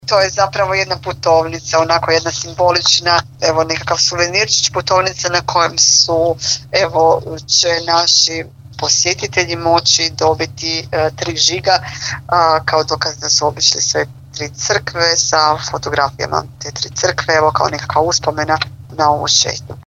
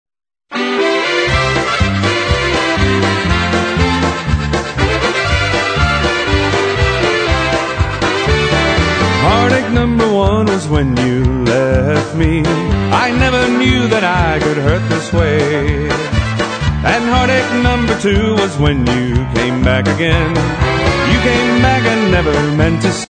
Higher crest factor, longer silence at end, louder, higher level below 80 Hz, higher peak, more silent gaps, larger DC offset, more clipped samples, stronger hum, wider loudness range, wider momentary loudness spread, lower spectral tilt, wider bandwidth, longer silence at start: about the same, 14 dB vs 12 dB; about the same, 0.1 s vs 0.05 s; about the same, -14 LUFS vs -13 LUFS; second, -44 dBFS vs -24 dBFS; about the same, 0 dBFS vs 0 dBFS; neither; neither; neither; neither; about the same, 3 LU vs 1 LU; first, 8 LU vs 4 LU; second, -2 dB/octave vs -5.5 dB/octave; first, 16 kHz vs 9.4 kHz; second, 0.05 s vs 0.5 s